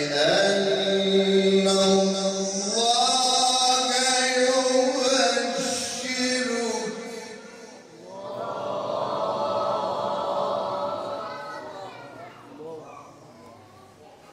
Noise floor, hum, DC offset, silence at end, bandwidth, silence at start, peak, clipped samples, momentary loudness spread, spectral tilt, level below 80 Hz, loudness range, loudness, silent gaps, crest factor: -49 dBFS; none; under 0.1%; 0.2 s; 15 kHz; 0 s; -8 dBFS; under 0.1%; 21 LU; -2.5 dB/octave; -68 dBFS; 11 LU; -23 LUFS; none; 16 dB